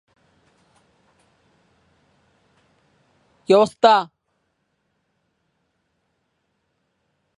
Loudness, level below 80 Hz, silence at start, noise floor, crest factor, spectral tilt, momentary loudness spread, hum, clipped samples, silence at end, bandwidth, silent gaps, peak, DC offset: -16 LUFS; -74 dBFS; 3.5 s; -72 dBFS; 26 dB; -5 dB/octave; 23 LU; none; under 0.1%; 3.35 s; 11.5 kHz; none; 0 dBFS; under 0.1%